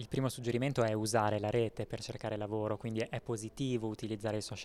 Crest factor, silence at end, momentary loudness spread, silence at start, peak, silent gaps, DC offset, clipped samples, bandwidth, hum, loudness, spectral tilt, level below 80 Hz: 18 dB; 0 s; 8 LU; 0 s; -18 dBFS; none; under 0.1%; under 0.1%; 14.5 kHz; none; -36 LUFS; -5.5 dB/octave; -60 dBFS